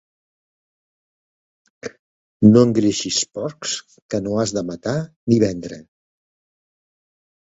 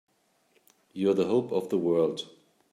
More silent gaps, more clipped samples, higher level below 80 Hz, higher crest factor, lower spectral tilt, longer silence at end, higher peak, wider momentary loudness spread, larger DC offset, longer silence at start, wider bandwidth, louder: first, 1.99-2.40 s, 4.02-4.09 s, 5.16-5.27 s vs none; neither; first, -54 dBFS vs -78 dBFS; first, 22 dB vs 16 dB; second, -5.5 dB/octave vs -7 dB/octave; first, 1.8 s vs 0.45 s; first, 0 dBFS vs -14 dBFS; first, 23 LU vs 16 LU; neither; first, 1.85 s vs 0.95 s; second, 8 kHz vs 14.5 kHz; first, -19 LUFS vs -27 LUFS